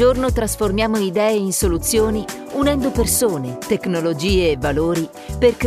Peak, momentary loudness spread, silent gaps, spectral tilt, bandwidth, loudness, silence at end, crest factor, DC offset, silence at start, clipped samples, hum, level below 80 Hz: -2 dBFS; 6 LU; none; -4.5 dB/octave; 15.5 kHz; -19 LUFS; 0 s; 16 dB; under 0.1%; 0 s; under 0.1%; none; -30 dBFS